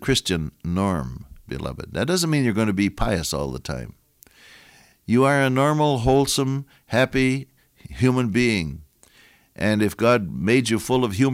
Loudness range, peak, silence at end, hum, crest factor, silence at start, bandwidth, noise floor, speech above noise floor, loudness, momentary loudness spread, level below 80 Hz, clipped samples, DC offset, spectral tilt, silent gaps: 4 LU; -6 dBFS; 0 s; none; 16 dB; 0 s; 16.5 kHz; -55 dBFS; 34 dB; -22 LUFS; 13 LU; -42 dBFS; under 0.1%; under 0.1%; -5.5 dB/octave; none